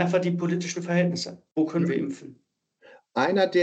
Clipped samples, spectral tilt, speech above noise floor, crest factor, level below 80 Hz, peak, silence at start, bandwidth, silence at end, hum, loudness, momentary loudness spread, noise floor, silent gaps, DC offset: under 0.1%; -6 dB/octave; 31 dB; 18 dB; -78 dBFS; -8 dBFS; 0 s; 8.4 kHz; 0 s; none; -26 LUFS; 9 LU; -56 dBFS; none; under 0.1%